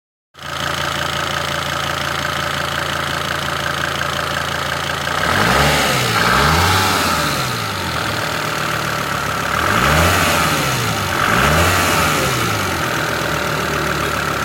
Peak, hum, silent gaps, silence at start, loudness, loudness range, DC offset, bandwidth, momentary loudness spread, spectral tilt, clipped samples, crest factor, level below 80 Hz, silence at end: -2 dBFS; none; none; 0.35 s; -16 LUFS; 5 LU; under 0.1%; 17 kHz; 7 LU; -3.5 dB/octave; under 0.1%; 16 dB; -36 dBFS; 0 s